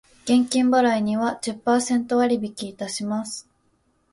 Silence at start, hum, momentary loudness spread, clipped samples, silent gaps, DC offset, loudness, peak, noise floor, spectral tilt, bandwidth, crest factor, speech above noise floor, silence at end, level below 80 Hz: 0.25 s; none; 12 LU; under 0.1%; none; under 0.1%; -22 LUFS; -8 dBFS; -66 dBFS; -4 dB/octave; 11.5 kHz; 14 dB; 44 dB; 0.7 s; -64 dBFS